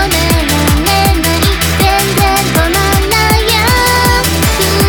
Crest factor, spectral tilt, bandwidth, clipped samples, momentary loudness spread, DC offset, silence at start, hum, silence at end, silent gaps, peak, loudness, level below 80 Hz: 10 dB; -3.5 dB/octave; over 20 kHz; under 0.1%; 2 LU; under 0.1%; 0 s; none; 0 s; none; 0 dBFS; -10 LUFS; -18 dBFS